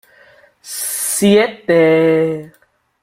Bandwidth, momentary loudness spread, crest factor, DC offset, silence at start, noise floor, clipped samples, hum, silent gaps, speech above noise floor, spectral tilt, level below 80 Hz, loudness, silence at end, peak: 16 kHz; 12 LU; 14 dB; under 0.1%; 0.65 s; -48 dBFS; under 0.1%; none; none; 35 dB; -4.5 dB/octave; -56 dBFS; -14 LUFS; 0.55 s; -2 dBFS